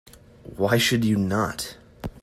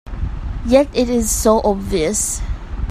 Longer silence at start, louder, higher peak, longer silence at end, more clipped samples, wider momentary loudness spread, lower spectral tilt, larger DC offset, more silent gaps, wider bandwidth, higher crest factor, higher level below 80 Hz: first, 0.45 s vs 0.05 s; second, -23 LUFS vs -17 LUFS; second, -8 dBFS vs 0 dBFS; about the same, 0.05 s vs 0 s; neither; first, 18 LU vs 13 LU; about the same, -4.5 dB/octave vs -4.5 dB/octave; neither; neither; about the same, 15 kHz vs 15.5 kHz; about the same, 18 dB vs 18 dB; second, -50 dBFS vs -26 dBFS